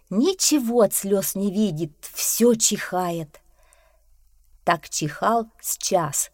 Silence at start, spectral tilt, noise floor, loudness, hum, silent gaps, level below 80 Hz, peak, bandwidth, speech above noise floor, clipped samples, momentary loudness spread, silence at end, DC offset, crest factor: 0.1 s; -3.5 dB/octave; -57 dBFS; -22 LUFS; none; none; -58 dBFS; -4 dBFS; 17 kHz; 35 dB; under 0.1%; 10 LU; 0.05 s; under 0.1%; 18 dB